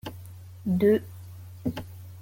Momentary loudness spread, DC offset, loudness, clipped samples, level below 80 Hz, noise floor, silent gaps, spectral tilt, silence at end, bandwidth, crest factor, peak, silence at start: 22 LU; under 0.1%; -27 LUFS; under 0.1%; -58 dBFS; -44 dBFS; none; -8 dB/octave; 0 s; 17 kHz; 18 dB; -12 dBFS; 0.05 s